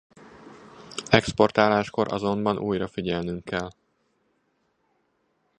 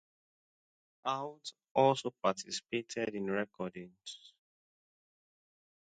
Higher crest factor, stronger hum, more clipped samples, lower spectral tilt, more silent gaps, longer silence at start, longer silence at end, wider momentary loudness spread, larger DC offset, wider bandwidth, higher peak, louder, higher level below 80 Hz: about the same, 26 dB vs 24 dB; neither; neither; about the same, -5.5 dB/octave vs -4.5 dB/octave; second, none vs 1.71-1.75 s; second, 0.35 s vs 1.05 s; first, 1.9 s vs 1.7 s; second, 12 LU vs 18 LU; neither; first, 10.5 kHz vs 9 kHz; first, 0 dBFS vs -14 dBFS; first, -24 LUFS vs -35 LUFS; first, -54 dBFS vs -80 dBFS